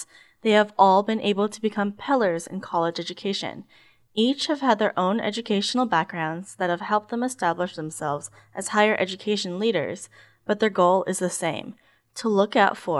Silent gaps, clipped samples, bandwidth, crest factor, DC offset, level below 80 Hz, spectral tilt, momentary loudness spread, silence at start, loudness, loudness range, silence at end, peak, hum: none; under 0.1%; 12.5 kHz; 20 dB; under 0.1%; -74 dBFS; -4.5 dB/octave; 12 LU; 0 s; -24 LUFS; 3 LU; 0 s; -4 dBFS; none